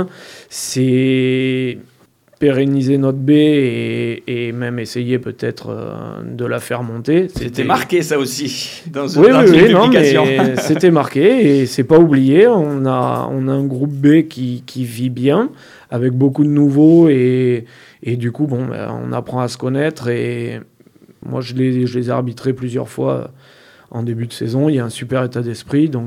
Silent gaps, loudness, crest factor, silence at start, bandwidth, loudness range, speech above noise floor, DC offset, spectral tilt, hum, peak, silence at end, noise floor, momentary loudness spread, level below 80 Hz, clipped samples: none; -15 LUFS; 14 dB; 0 s; 15.5 kHz; 10 LU; 33 dB; under 0.1%; -6.5 dB/octave; none; 0 dBFS; 0 s; -47 dBFS; 14 LU; -50 dBFS; under 0.1%